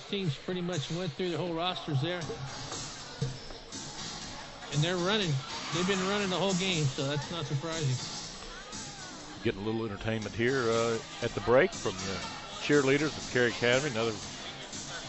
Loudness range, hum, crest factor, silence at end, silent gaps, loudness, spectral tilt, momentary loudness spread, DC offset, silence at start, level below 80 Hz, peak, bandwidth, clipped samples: 6 LU; none; 20 dB; 0 s; none; -32 LUFS; -4.5 dB/octave; 13 LU; under 0.1%; 0 s; -54 dBFS; -12 dBFS; 8.4 kHz; under 0.1%